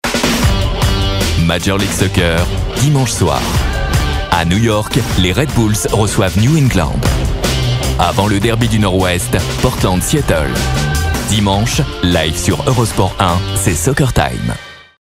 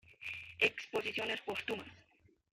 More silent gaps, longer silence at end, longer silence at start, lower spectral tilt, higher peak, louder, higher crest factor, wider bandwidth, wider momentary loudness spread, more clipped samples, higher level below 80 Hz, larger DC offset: neither; second, 0.2 s vs 0.55 s; about the same, 0.05 s vs 0.1 s; first, -5 dB/octave vs -3 dB/octave; first, 0 dBFS vs -16 dBFS; first, -14 LUFS vs -37 LUFS; second, 14 dB vs 24 dB; about the same, 16.5 kHz vs 16 kHz; second, 3 LU vs 12 LU; neither; first, -22 dBFS vs -74 dBFS; neither